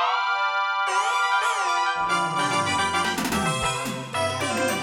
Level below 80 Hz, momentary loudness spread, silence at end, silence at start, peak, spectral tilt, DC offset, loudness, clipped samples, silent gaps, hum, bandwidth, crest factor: -52 dBFS; 4 LU; 0 s; 0 s; -10 dBFS; -3 dB/octave; under 0.1%; -23 LUFS; under 0.1%; none; none; 19.5 kHz; 14 dB